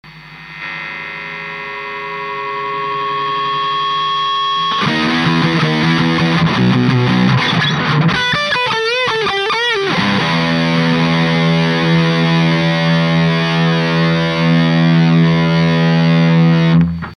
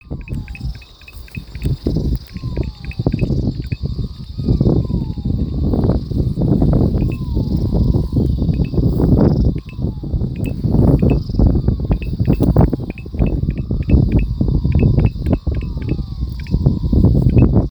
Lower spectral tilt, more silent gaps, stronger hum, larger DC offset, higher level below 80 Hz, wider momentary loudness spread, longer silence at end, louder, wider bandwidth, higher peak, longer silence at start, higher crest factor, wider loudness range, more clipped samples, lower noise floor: second, -6.5 dB/octave vs -10 dB/octave; neither; neither; neither; second, -44 dBFS vs -22 dBFS; about the same, 11 LU vs 12 LU; about the same, 0.05 s vs 0 s; first, -14 LUFS vs -17 LUFS; second, 9.8 kHz vs over 20 kHz; about the same, 0 dBFS vs 0 dBFS; about the same, 0.05 s vs 0.05 s; about the same, 14 dB vs 16 dB; about the same, 6 LU vs 6 LU; neither; about the same, -34 dBFS vs -36 dBFS